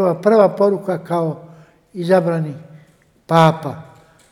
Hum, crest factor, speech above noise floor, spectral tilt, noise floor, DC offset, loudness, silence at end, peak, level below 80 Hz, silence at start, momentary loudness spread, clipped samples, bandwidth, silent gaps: none; 18 dB; 36 dB; -7.5 dB/octave; -52 dBFS; under 0.1%; -17 LUFS; 0.5 s; 0 dBFS; -64 dBFS; 0 s; 20 LU; 0.1%; 12.5 kHz; none